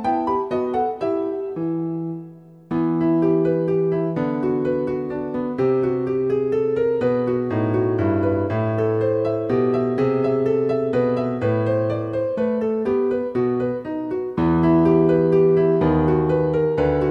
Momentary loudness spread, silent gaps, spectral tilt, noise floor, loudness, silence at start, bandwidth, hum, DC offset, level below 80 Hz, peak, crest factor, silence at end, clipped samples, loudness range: 9 LU; none; -10 dB/octave; -41 dBFS; -21 LUFS; 0 s; 5.8 kHz; none; under 0.1%; -46 dBFS; -6 dBFS; 14 dB; 0 s; under 0.1%; 4 LU